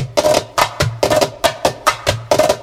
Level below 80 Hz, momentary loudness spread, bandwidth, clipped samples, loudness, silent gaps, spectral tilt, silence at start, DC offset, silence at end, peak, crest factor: -38 dBFS; 3 LU; 16.5 kHz; under 0.1%; -16 LUFS; none; -3.5 dB/octave; 0 s; under 0.1%; 0 s; 0 dBFS; 16 dB